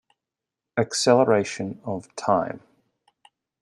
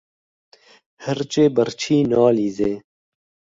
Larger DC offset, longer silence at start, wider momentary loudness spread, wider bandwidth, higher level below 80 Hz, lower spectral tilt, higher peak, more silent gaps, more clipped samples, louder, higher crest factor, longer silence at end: neither; second, 0.75 s vs 1 s; first, 14 LU vs 11 LU; first, 12.5 kHz vs 7.8 kHz; second, -68 dBFS vs -56 dBFS; second, -4.5 dB/octave vs -6 dB/octave; about the same, -4 dBFS vs -4 dBFS; neither; neither; second, -23 LUFS vs -19 LUFS; about the same, 22 dB vs 18 dB; first, 1.05 s vs 0.7 s